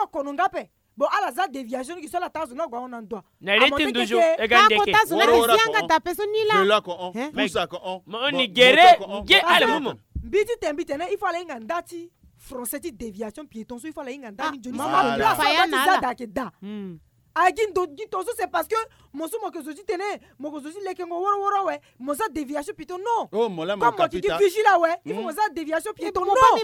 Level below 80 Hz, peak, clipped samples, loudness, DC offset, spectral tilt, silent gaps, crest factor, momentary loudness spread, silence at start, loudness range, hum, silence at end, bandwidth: -52 dBFS; -4 dBFS; under 0.1%; -21 LUFS; under 0.1%; -3 dB/octave; none; 18 dB; 18 LU; 0 s; 11 LU; none; 0 s; 17.5 kHz